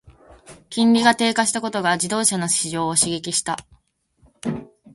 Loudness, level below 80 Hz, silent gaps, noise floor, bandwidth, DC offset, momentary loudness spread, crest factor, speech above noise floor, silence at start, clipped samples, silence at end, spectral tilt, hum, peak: -20 LUFS; -58 dBFS; none; -61 dBFS; 11.5 kHz; under 0.1%; 14 LU; 20 dB; 41 dB; 0.05 s; under 0.1%; 0.05 s; -2.5 dB/octave; none; -2 dBFS